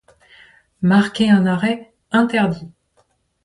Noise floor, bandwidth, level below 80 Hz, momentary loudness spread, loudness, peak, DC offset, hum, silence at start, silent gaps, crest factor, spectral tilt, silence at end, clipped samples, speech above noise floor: -62 dBFS; 11 kHz; -56 dBFS; 7 LU; -17 LUFS; -2 dBFS; under 0.1%; none; 0.8 s; none; 16 dB; -7 dB/octave; 0.75 s; under 0.1%; 46 dB